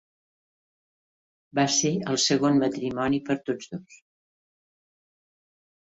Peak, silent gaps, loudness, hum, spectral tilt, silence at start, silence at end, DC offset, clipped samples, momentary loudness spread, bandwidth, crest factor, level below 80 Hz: -10 dBFS; none; -25 LUFS; none; -4 dB/octave; 1.55 s; 1.9 s; under 0.1%; under 0.1%; 11 LU; 8 kHz; 18 dB; -64 dBFS